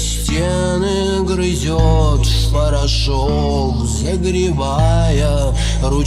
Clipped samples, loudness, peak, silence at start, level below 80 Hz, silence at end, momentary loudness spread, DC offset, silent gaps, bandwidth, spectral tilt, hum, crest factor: under 0.1%; -16 LUFS; -2 dBFS; 0 s; -18 dBFS; 0 s; 3 LU; 0.9%; none; 13.5 kHz; -5.5 dB/octave; none; 12 dB